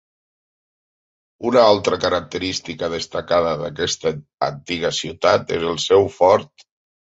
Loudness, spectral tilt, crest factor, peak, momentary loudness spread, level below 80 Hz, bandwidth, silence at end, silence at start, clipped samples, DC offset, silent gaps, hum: -19 LUFS; -4 dB/octave; 18 dB; -2 dBFS; 10 LU; -50 dBFS; 8 kHz; 0.6 s; 1.4 s; under 0.1%; under 0.1%; 4.34-4.38 s; none